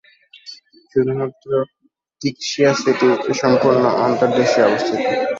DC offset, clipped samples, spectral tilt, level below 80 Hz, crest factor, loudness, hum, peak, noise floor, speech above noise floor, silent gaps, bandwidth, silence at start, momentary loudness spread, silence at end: under 0.1%; under 0.1%; -5 dB/octave; -60 dBFS; 16 dB; -17 LUFS; none; -2 dBFS; -42 dBFS; 26 dB; none; 7.8 kHz; 0.45 s; 11 LU; 0 s